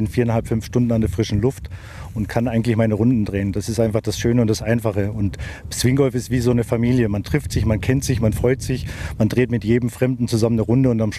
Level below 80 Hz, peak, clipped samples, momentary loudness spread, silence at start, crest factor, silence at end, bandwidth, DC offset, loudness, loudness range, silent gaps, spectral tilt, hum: -36 dBFS; -2 dBFS; under 0.1%; 8 LU; 0 s; 16 dB; 0 s; 14 kHz; under 0.1%; -20 LUFS; 1 LU; none; -6.5 dB/octave; none